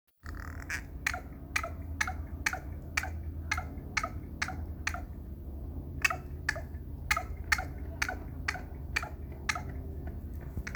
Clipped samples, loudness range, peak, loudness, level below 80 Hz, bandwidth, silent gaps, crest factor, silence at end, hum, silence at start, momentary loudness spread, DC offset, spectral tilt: under 0.1%; 3 LU; -12 dBFS; -36 LUFS; -42 dBFS; over 20 kHz; none; 24 dB; 0 s; none; 0.25 s; 11 LU; under 0.1%; -3.5 dB/octave